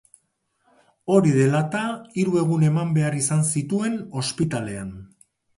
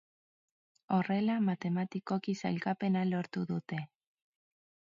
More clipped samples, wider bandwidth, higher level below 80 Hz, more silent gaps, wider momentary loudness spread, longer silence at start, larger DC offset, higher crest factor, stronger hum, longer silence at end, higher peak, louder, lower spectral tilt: neither; first, 11.5 kHz vs 7.4 kHz; first, -58 dBFS vs -78 dBFS; neither; first, 12 LU vs 7 LU; first, 1.05 s vs 0.9 s; neither; about the same, 18 dB vs 18 dB; neither; second, 0.5 s vs 1 s; first, -4 dBFS vs -18 dBFS; first, -22 LUFS vs -34 LUFS; second, -6 dB/octave vs -7.5 dB/octave